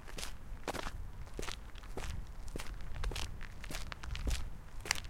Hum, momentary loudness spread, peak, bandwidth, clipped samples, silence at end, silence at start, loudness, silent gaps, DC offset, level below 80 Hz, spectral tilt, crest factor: none; 8 LU; -6 dBFS; 16.5 kHz; under 0.1%; 0 s; 0 s; -44 LUFS; none; under 0.1%; -44 dBFS; -3 dB/octave; 34 dB